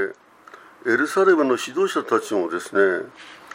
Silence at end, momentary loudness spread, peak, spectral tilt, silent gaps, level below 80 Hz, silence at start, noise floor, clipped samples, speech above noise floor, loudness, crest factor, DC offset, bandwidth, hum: 0 s; 12 LU; -4 dBFS; -4 dB/octave; none; -74 dBFS; 0 s; -47 dBFS; under 0.1%; 27 dB; -21 LUFS; 18 dB; under 0.1%; 16 kHz; none